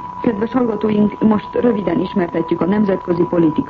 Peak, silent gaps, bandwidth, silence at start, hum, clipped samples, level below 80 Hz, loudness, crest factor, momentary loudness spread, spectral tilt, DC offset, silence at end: -4 dBFS; none; 5.2 kHz; 0 s; none; under 0.1%; -46 dBFS; -17 LUFS; 12 dB; 4 LU; -10 dB/octave; under 0.1%; 0 s